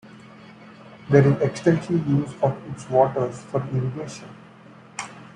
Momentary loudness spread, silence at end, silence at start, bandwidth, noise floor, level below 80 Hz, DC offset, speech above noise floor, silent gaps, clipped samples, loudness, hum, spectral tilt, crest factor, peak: 18 LU; 0.1 s; 0.05 s; 10 kHz; -47 dBFS; -58 dBFS; under 0.1%; 25 dB; none; under 0.1%; -22 LUFS; none; -7.5 dB/octave; 22 dB; -2 dBFS